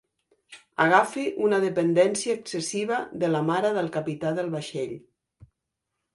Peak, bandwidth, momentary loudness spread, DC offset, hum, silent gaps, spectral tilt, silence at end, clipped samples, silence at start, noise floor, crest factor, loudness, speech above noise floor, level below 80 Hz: -4 dBFS; 11.5 kHz; 11 LU; under 0.1%; none; none; -5 dB/octave; 1.15 s; under 0.1%; 0.5 s; -83 dBFS; 22 dB; -25 LUFS; 58 dB; -68 dBFS